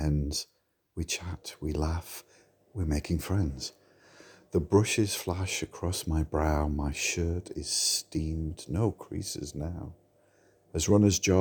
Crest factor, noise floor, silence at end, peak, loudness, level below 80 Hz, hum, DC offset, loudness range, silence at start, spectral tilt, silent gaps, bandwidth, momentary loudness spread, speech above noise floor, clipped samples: 20 dB; -64 dBFS; 0 s; -10 dBFS; -30 LUFS; -42 dBFS; none; under 0.1%; 5 LU; 0 s; -4.5 dB/octave; none; over 20 kHz; 14 LU; 35 dB; under 0.1%